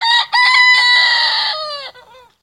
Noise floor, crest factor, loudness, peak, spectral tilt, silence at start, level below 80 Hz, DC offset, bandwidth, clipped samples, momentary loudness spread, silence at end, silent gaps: -43 dBFS; 14 dB; -10 LUFS; 0 dBFS; 3 dB/octave; 0 s; -66 dBFS; under 0.1%; 13 kHz; under 0.1%; 15 LU; 0.5 s; none